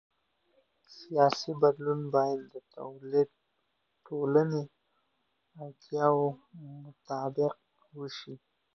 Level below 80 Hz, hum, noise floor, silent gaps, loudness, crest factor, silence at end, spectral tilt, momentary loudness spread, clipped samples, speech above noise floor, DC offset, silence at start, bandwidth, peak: -80 dBFS; none; -78 dBFS; none; -30 LUFS; 22 dB; 0.4 s; -7 dB/octave; 21 LU; under 0.1%; 48 dB; under 0.1%; 0.9 s; 6.8 kHz; -10 dBFS